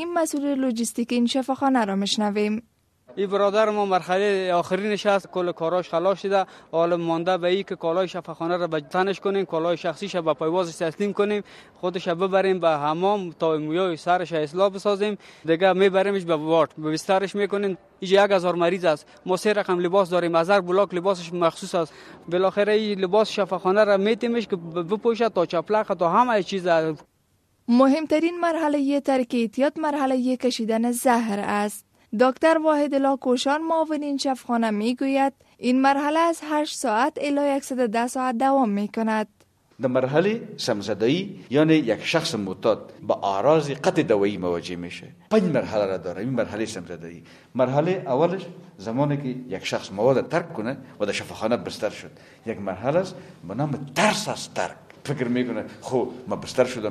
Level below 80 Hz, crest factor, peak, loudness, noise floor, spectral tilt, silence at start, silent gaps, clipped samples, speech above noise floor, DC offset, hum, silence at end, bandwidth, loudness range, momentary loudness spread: -66 dBFS; 18 dB; -6 dBFS; -23 LUFS; -66 dBFS; -5.5 dB/octave; 0 s; none; under 0.1%; 43 dB; under 0.1%; none; 0 s; 13.5 kHz; 4 LU; 10 LU